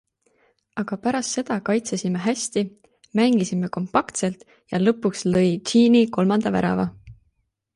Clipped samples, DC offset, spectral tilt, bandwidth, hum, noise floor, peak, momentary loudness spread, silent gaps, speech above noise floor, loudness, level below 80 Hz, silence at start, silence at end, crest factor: under 0.1%; under 0.1%; -5.5 dB/octave; 11.5 kHz; none; -70 dBFS; -4 dBFS; 11 LU; none; 49 dB; -22 LUFS; -56 dBFS; 0.75 s; 0.65 s; 18 dB